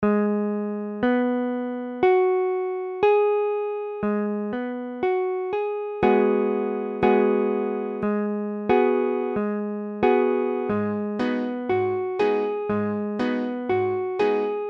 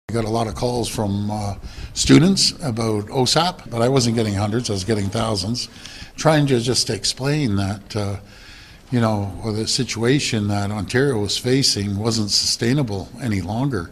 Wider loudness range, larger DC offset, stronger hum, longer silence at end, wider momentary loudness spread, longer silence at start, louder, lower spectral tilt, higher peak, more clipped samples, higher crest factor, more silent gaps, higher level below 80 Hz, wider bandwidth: about the same, 2 LU vs 4 LU; neither; neither; about the same, 0 s vs 0 s; about the same, 8 LU vs 9 LU; about the same, 0 s vs 0.1 s; second, -24 LUFS vs -20 LUFS; first, -8.5 dB/octave vs -4.5 dB/octave; second, -8 dBFS vs 0 dBFS; neither; about the same, 16 dB vs 20 dB; neither; second, -58 dBFS vs -42 dBFS; second, 5.8 kHz vs 14.5 kHz